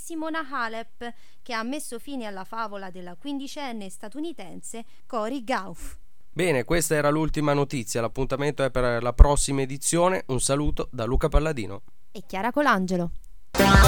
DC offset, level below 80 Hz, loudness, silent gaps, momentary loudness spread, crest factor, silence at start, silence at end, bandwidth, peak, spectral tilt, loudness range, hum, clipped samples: 2%; -30 dBFS; -26 LUFS; none; 17 LU; 24 dB; 0 s; 0 s; 19 kHz; 0 dBFS; -4.5 dB/octave; 10 LU; none; under 0.1%